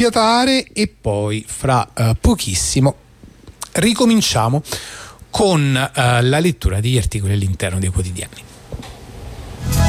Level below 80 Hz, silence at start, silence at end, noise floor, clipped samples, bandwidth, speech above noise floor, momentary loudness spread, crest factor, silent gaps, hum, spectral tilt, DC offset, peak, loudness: -30 dBFS; 0 s; 0 s; -41 dBFS; under 0.1%; 16 kHz; 25 dB; 20 LU; 14 dB; none; none; -5 dB/octave; under 0.1%; -4 dBFS; -17 LUFS